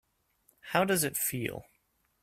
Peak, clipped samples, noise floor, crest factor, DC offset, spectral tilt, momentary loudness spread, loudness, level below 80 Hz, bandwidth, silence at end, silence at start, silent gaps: -10 dBFS; under 0.1%; -74 dBFS; 24 dB; under 0.1%; -3.5 dB/octave; 11 LU; -30 LUFS; -66 dBFS; 16 kHz; 0.6 s; 0.65 s; none